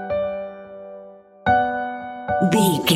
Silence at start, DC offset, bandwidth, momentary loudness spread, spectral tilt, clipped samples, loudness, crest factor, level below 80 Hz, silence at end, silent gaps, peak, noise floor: 0 s; under 0.1%; 16 kHz; 20 LU; -4.5 dB/octave; under 0.1%; -21 LUFS; 18 dB; -50 dBFS; 0 s; none; -4 dBFS; -43 dBFS